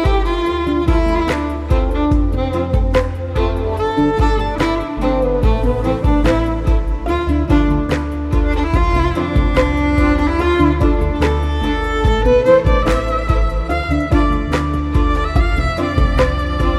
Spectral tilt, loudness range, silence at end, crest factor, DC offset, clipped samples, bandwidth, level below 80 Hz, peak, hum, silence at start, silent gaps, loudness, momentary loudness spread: -7.5 dB/octave; 2 LU; 0 s; 14 dB; under 0.1%; under 0.1%; 11 kHz; -18 dBFS; 0 dBFS; none; 0 s; none; -16 LUFS; 5 LU